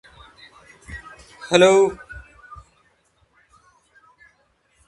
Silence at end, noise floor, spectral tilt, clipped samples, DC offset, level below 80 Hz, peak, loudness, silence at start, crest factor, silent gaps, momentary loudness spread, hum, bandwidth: 2.65 s; -63 dBFS; -4 dB/octave; under 0.1%; under 0.1%; -52 dBFS; -2 dBFS; -16 LUFS; 0.9 s; 24 dB; none; 29 LU; none; 11.5 kHz